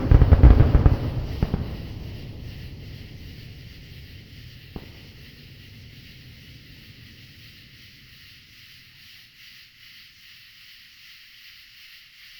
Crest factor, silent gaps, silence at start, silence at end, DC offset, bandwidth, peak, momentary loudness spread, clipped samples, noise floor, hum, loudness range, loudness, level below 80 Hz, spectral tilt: 24 dB; none; 0 s; 9 s; under 0.1%; 19.5 kHz; 0 dBFS; 27 LU; under 0.1%; -49 dBFS; none; 21 LU; -20 LUFS; -26 dBFS; -8.5 dB/octave